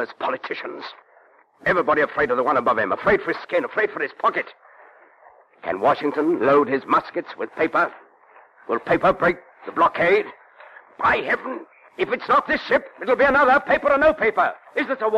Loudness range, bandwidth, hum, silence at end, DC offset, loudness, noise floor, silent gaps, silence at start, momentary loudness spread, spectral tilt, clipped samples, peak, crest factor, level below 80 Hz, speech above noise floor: 4 LU; 9.8 kHz; none; 0 s; under 0.1%; -20 LUFS; -55 dBFS; none; 0 s; 13 LU; -6.5 dB/octave; under 0.1%; -6 dBFS; 14 dB; -54 dBFS; 34 dB